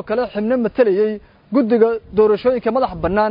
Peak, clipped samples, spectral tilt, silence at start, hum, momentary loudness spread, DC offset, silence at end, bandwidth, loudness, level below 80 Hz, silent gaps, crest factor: -2 dBFS; under 0.1%; -10 dB/octave; 0.05 s; none; 6 LU; under 0.1%; 0 s; 5.4 kHz; -17 LUFS; -44 dBFS; none; 16 dB